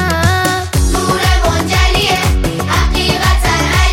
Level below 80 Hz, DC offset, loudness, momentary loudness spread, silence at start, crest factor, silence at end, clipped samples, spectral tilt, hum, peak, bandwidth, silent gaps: -16 dBFS; under 0.1%; -13 LUFS; 3 LU; 0 s; 12 dB; 0 s; under 0.1%; -4 dB/octave; none; 0 dBFS; 17 kHz; none